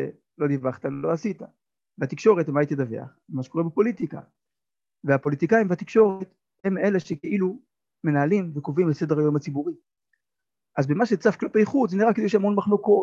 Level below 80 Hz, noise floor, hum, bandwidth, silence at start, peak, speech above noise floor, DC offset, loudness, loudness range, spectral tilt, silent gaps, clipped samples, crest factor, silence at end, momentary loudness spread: -68 dBFS; under -90 dBFS; none; 7.4 kHz; 0 s; -6 dBFS; over 67 dB; under 0.1%; -24 LUFS; 2 LU; -8 dB/octave; none; under 0.1%; 18 dB; 0 s; 13 LU